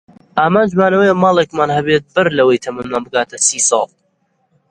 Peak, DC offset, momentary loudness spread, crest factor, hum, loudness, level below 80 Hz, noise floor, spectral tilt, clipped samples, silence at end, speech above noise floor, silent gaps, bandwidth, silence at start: 0 dBFS; under 0.1%; 8 LU; 14 dB; none; -14 LUFS; -52 dBFS; -63 dBFS; -3.5 dB/octave; under 0.1%; 0.85 s; 49 dB; none; 11 kHz; 0.35 s